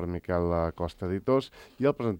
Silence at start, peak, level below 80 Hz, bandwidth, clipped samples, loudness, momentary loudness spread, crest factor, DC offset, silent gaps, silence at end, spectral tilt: 0 s; -12 dBFS; -52 dBFS; 16.5 kHz; under 0.1%; -29 LUFS; 6 LU; 16 dB; under 0.1%; none; 0 s; -8.5 dB/octave